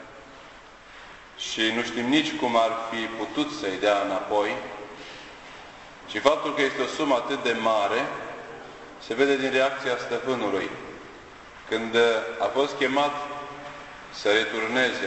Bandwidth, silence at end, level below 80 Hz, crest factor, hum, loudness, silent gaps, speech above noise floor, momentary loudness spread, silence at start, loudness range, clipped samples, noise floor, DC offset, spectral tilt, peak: 8.4 kHz; 0 s; -60 dBFS; 22 dB; none; -25 LUFS; none; 22 dB; 21 LU; 0 s; 2 LU; under 0.1%; -47 dBFS; under 0.1%; -3.5 dB/octave; -4 dBFS